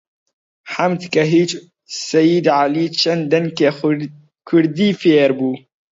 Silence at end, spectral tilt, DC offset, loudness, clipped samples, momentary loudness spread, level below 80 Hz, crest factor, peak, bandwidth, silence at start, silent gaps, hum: 0.35 s; -5.5 dB/octave; under 0.1%; -16 LUFS; under 0.1%; 13 LU; -64 dBFS; 16 dB; -2 dBFS; 7.8 kHz; 0.65 s; none; none